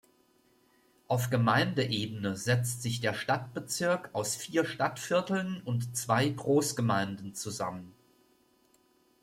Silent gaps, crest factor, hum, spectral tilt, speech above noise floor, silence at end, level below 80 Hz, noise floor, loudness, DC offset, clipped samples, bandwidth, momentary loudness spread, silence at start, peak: none; 20 dB; none; -4.5 dB/octave; 37 dB; 1.3 s; -68 dBFS; -67 dBFS; -31 LUFS; under 0.1%; under 0.1%; 16.5 kHz; 8 LU; 1.1 s; -12 dBFS